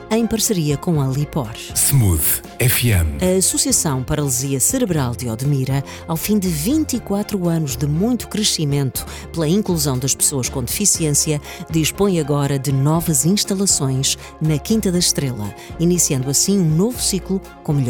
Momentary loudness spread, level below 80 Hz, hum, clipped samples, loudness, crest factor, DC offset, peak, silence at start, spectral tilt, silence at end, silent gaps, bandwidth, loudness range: 7 LU; -38 dBFS; none; under 0.1%; -17 LUFS; 16 dB; under 0.1%; -2 dBFS; 0 s; -4.5 dB/octave; 0 s; none; 19.5 kHz; 3 LU